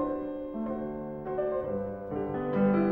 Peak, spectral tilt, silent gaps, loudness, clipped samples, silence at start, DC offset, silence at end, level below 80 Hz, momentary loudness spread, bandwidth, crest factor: -16 dBFS; -11 dB/octave; none; -32 LUFS; under 0.1%; 0 s; under 0.1%; 0 s; -54 dBFS; 9 LU; 4.6 kHz; 16 dB